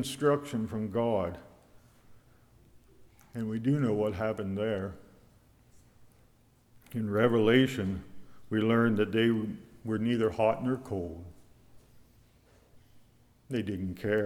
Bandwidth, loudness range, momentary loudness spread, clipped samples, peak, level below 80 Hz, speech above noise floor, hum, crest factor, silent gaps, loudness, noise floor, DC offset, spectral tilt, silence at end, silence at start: 16 kHz; 8 LU; 15 LU; under 0.1%; -10 dBFS; -60 dBFS; 35 dB; none; 22 dB; none; -30 LUFS; -64 dBFS; under 0.1%; -7 dB/octave; 0 s; 0 s